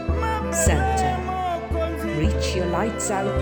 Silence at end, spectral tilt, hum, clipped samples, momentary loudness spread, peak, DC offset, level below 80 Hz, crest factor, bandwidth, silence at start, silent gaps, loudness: 0 s; -5 dB/octave; none; under 0.1%; 6 LU; -6 dBFS; under 0.1%; -30 dBFS; 16 dB; over 20 kHz; 0 s; none; -23 LUFS